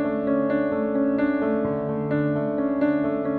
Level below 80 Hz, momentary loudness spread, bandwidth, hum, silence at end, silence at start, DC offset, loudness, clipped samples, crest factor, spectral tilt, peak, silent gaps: -54 dBFS; 2 LU; 4.4 kHz; none; 0 s; 0 s; under 0.1%; -24 LUFS; under 0.1%; 12 dB; -11 dB/octave; -12 dBFS; none